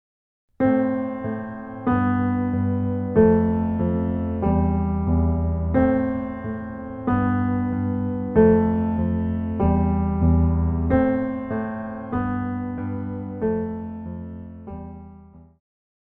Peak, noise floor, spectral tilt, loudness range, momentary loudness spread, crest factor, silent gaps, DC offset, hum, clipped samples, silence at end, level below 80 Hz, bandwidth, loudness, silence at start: -4 dBFS; -46 dBFS; -12.5 dB/octave; 8 LU; 13 LU; 18 dB; none; under 0.1%; none; under 0.1%; 0.65 s; -34 dBFS; 3.5 kHz; -23 LUFS; 0.6 s